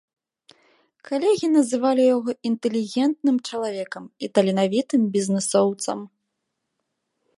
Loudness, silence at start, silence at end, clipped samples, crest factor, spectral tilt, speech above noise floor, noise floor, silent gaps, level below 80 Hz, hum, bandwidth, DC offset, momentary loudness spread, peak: -22 LUFS; 1.1 s; 1.3 s; under 0.1%; 20 dB; -5 dB/octave; 57 dB; -79 dBFS; none; -74 dBFS; none; 11.5 kHz; under 0.1%; 10 LU; -4 dBFS